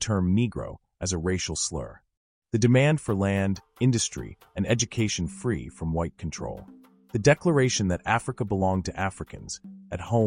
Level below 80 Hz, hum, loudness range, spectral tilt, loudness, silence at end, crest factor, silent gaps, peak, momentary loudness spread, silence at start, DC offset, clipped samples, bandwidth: -46 dBFS; none; 3 LU; -5 dB/octave; -26 LUFS; 0 s; 20 dB; 2.17-2.42 s; -6 dBFS; 16 LU; 0 s; under 0.1%; under 0.1%; 11 kHz